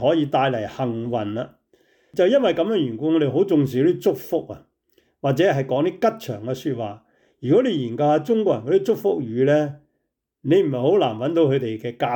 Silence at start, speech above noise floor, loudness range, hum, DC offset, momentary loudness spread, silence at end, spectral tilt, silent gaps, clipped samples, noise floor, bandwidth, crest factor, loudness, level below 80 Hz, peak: 0 s; 56 dB; 2 LU; none; under 0.1%; 10 LU; 0 s; -7.5 dB/octave; none; under 0.1%; -76 dBFS; 19.5 kHz; 14 dB; -21 LUFS; -66 dBFS; -8 dBFS